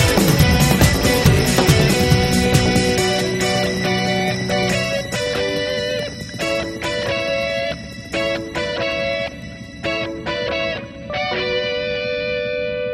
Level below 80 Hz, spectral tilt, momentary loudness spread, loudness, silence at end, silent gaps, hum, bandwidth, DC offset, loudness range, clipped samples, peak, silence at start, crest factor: -32 dBFS; -4.5 dB/octave; 10 LU; -18 LUFS; 0 s; none; none; 16.5 kHz; under 0.1%; 8 LU; under 0.1%; 0 dBFS; 0 s; 18 dB